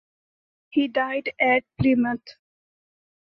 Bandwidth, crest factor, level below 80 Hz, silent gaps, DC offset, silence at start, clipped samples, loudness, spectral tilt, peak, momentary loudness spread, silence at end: 6 kHz; 18 dB; -54 dBFS; none; under 0.1%; 0.75 s; under 0.1%; -23 LUFS; -8.5 dB/octave; -8 dBFS; 6 LU; 0.95 s